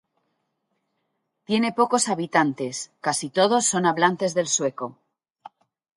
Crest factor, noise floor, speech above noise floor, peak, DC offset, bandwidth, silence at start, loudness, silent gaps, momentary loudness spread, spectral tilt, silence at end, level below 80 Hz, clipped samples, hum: 20 dB; -76 dBFS; 54 dB; -4 dBFS; under 0.1%; 11.5 kHz; 1.5 s; -22 LUFS; none; 9 LU; -3 dB/octave; 1.05 s; -72 dBFS; under 0.1%; none